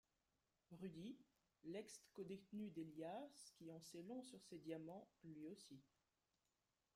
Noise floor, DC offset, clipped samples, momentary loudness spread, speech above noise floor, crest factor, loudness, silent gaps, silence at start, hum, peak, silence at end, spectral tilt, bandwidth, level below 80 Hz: under -90 dBFS; under 0.1%; under 0.1%; 9 LU; over 34 dB; 18 dB; -57 LUFS; none; 0.7 s; none; -40 dBFS; 1.1 s; -5.5 dB/octave; 15.5 kHz; -90 dBFS